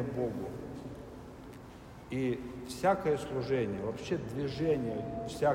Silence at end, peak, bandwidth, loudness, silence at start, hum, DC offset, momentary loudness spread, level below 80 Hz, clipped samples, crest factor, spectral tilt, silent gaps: 0 s; -16 dBFS; 16 kHz; -35 LUFS; 0 s; none; under 0.1%; 17 LU; -56 dBFS; under 0.1%; 20 dB; -6.5 dB/octave; none